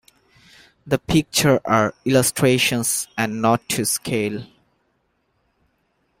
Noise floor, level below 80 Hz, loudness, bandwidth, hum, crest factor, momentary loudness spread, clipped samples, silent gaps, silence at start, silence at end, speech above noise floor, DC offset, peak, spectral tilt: -68 dBFS; -50 dBFS; -19 LUFS; 16.5 kHz; none; 20 dB; 8 LU; under 0.1%; none; 0.85 s; 1.75 s; 48 dB; under 0.1%; -2 dBFS; -4 dB/octave